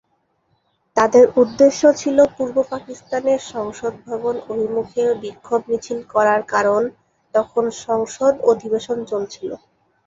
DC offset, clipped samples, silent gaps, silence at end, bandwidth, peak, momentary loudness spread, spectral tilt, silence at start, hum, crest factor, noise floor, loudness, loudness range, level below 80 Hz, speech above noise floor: under 0.1%; under 0.1%; none; 0.5 s; 7.8 kHz; -2 dBFS; 13 LU; -4.5 dB/octave; 0.95 s; none; 18 dB; -66 dBFS; -19 LUFS; 6 LU; -58 dBFS; 48 dB